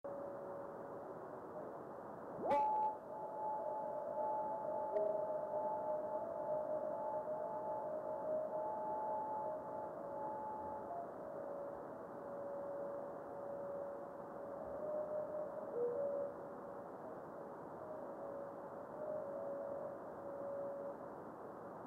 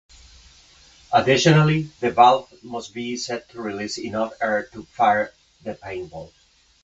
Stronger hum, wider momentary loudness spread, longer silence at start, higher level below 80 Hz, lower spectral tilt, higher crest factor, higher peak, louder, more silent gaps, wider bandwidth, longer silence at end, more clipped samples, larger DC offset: neither; second, 10 LU vs 19 LU; second, 0.05 s vs 1.1 s; second, -80 dBFS vs -54 dBFS; first, -8 dB/octave vs -5.5 dB/octave; second, 16 dB vs 22 dB; second, -28 dBFS vs 0 dBFS; second, -44 LUFS vs -21 LUFS; neither; first, 12 kHz vs 8 kHz; second, 0 s vs 0.6 s; neither; neither